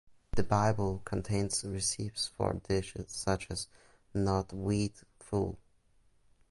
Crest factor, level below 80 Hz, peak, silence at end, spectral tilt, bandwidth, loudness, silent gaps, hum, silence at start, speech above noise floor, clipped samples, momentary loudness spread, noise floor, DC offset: 20 dB; -50 dBFS; -14 dBFS; 0.9 s; -5 dB/octave; 11.5 kHz; -34 LUFS; none; none; 0.1 s; 34 dB; under 0.1%; 9 LU; -67 dBFS; under 0.1%